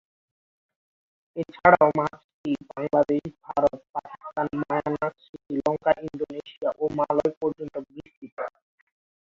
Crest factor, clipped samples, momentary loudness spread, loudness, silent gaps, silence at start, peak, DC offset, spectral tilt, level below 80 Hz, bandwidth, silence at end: 24 dB; under 0.1%; 16 LU; -26 LUFS; 2.24-2.44 s, 3.89-3.93 s, 5.29-5.33 s, 7.37-7.41 s, 8.17-8.22 s, 8.32-8.37 s; 1.35 s; -2 dBFS; under 0.1%; -8 dB/octave; -60 dBFS; 7.4 kHz; 0.8 s